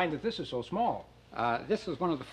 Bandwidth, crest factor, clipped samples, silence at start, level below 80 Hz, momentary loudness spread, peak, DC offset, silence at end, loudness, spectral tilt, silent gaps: 10.5 kHz; 18 dB; under 0.1%; 0 s; -60 dBFS; 5 LU; -16 dBFS; under 0.1%; 0 s; -33 LUFS; -6.5 dB/octave; none